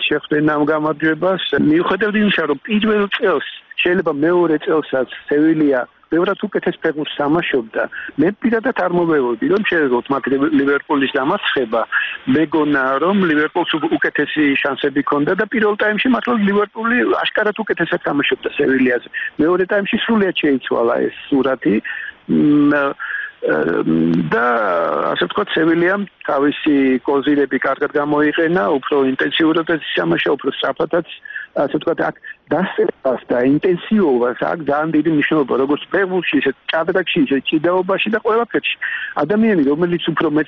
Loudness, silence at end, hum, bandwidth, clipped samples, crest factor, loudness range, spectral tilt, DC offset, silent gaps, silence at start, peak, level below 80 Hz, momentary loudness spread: -17 LUFS; 0 s; none; 5.4 kHz; under 0.1%; 12 dB; 2 LU; -3.5 dB/octave; under 0.1%; none; 0 s; -4 dBFS; -54 dBFS; 5 LU